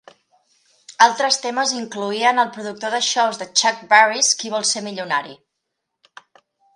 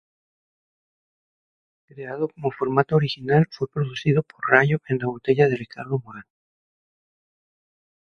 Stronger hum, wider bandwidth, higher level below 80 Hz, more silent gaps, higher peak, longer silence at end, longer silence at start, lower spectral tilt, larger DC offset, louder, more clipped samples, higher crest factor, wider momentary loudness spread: neither; first, 11.5 kHz vs 6.6 kHz; second, -78 dBFS vs -60 dBFS; neither; about the same, 0 dBFS vs 0 dBFS; second, 1.4 s vs 1.9 s; second, 0.9 s vs 1.95 s; second, -0.5 dB/octave vs -8 dB/octave; neither; first, -18 LUFS vs -22 LUFS; neither; about the same, 20 dB vs 24 dB; about the same, 10 LU vs 11 LU